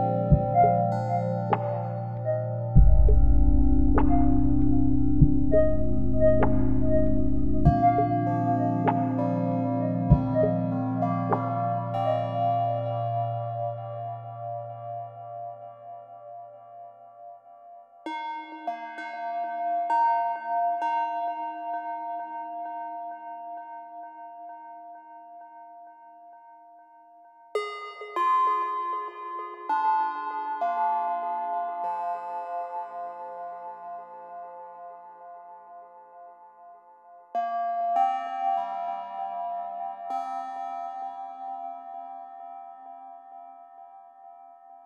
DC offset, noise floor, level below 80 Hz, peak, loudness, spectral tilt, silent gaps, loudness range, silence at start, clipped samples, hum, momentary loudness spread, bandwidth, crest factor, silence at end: under 0.1%; -53 dBFS; -34 dBFS; -4 dBFS; -27 LUFS; -10 dB/octave; none; 18 LU; 0 s; under 0.1%; none; 22 LU; 5.6 kHz; 22 dB; 0 s